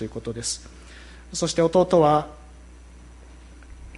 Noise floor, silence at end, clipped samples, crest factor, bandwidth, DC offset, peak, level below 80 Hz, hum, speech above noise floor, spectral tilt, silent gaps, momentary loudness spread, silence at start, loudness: -45 dBFS; 0 s; under 0.1%; 18 dB; 11.5 kHz; under 0.1%; -6 dBFS; -46 dBFS; none; 23 dB; -5 dB/octave; none; 26 LU; 0 s; -22 LUFS